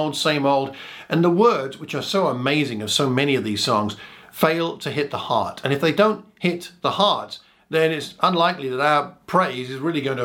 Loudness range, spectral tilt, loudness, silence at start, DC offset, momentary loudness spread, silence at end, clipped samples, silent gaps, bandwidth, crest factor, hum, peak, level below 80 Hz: 2 LU; -5 dB/octave; -21 LUFS; 0 s; under 0.1%; 8 LU; 0 s; under 0.1%; none; 17 kHz; 20 dB; none; -2 dBFS; -66 dBFS